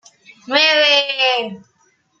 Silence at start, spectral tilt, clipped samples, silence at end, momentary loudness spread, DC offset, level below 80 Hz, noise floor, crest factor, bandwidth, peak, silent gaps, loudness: 0.45 s; -1.5 dB/octave; under 0.1%; 0.65 s; 10 LU; under 0.1%; -74 dBFS; -60 dBFS; 18 dB; 7.8 kHz; 0 dBFS; none; -14 LUFS